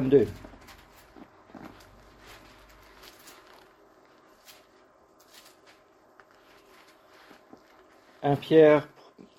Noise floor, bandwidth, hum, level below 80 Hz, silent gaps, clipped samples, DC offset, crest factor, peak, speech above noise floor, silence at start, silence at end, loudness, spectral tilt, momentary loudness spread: -59 dBFS; 14.5 kHz; none; -62 dBFS; none; under 0.1%; under 0.1%; 24 dB; -6 dBFS; 39 dB; 0 s; 0.55 s; -22 LUFS; -7.5 dB/octave; 32 LU